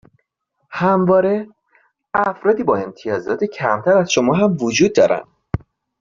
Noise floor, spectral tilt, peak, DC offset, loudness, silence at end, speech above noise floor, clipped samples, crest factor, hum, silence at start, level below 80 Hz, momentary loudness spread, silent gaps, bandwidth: -71 dBFS; -5.5 dB/octave; -2 dBFS; under 0.1%; -17 LUFS; 0.45 s; 55 dB; under 0.1%; 16 dB; none; 0.7 s; -48 dBFS; 14 LU; none; 7.6 kHz